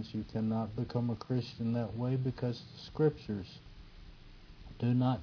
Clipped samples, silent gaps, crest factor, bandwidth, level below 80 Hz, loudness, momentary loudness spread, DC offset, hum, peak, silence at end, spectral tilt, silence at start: under 0.1%; none; 18 dB; 5.4 kHz; -56 dBFS; -35 LUFS; 22 LU; under 0.1%; none; -18 dBFS; 0 s; -9 dB/octave; 0 s